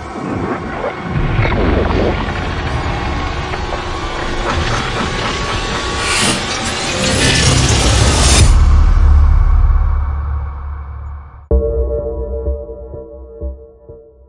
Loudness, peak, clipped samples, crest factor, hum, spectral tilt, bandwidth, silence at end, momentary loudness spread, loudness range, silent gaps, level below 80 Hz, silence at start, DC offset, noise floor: -15 LUFS; 0 dBFS; under 0.1%; 14 dB; none; -4 dB/octave; 11.5 kHz; 0.25 s; 17 LU; 10 LU; none; -18 dBFS; 0 s; under 0.1%; -38 dBFS